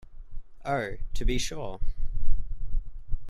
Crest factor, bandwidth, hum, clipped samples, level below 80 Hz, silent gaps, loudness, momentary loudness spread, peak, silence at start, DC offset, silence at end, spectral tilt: 16 dB; 10.5 kHz; none; under 0.1%; -30 dBFS; none; -35 LUFS; 13 LU; -8 dBFS; 0.1 s; under 0.1%; 0 s; -4.5 dB/octave